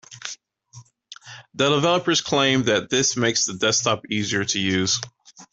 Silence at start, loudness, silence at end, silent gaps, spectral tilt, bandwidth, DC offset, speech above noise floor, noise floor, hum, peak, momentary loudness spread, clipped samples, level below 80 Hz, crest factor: 0.1 s; -20 LUFS; 0.1 s; none; -3 dB/octave; 8.4 kHz; under 0.1%; 27 dB; -48 dBFS; none; -6 dBFS; 18 LU; under 0.1%; -60 dBFS; 18 dB